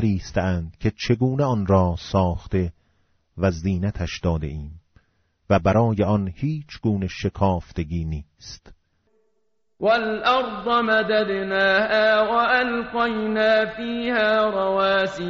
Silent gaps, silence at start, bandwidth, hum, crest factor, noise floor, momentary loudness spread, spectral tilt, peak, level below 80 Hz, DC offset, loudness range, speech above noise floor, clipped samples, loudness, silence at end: none; 0 s; 7.4 kHz; none; 16 dB; -74 dBFS; 9 LU; -4.5 dB/octave; -6 dBFS; -42 dBFS; under 0.1%; 7 LU; 53 dB; under 0.1%; -22 LUFS; 0 s